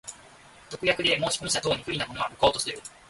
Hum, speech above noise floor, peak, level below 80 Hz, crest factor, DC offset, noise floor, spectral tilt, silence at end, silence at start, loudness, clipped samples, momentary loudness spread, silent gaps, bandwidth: none; 24 dB; -8 dBFS; -54 dBFS; 22 dB; under 0.1%; -52 dBFS; -2.5 dB/octave; 0.2 s; 0.05 s; -26 LUFS; under 0.1%; 9 LU; none; 12 kHz